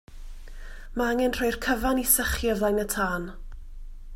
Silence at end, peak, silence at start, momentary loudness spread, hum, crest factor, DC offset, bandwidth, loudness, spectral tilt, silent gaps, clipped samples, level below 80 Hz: 0 s; -6 dBFS; 0.1 s; 19 LU; none; 20 dB; under 0.1%; 16 kHz; -25 LUFS; -3.5 dB/octave; none; under 0.1%; -38 dBFS